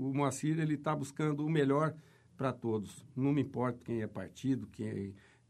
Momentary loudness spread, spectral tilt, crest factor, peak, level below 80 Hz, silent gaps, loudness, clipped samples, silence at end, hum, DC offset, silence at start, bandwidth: 10 LU; -7 dB/octave; 16 dB; -18 dBFS; -70 dBFS; none; -35 LUFS; under 0.1%; 0.3 s; none; under 0.1%; 0 s; 13 kHz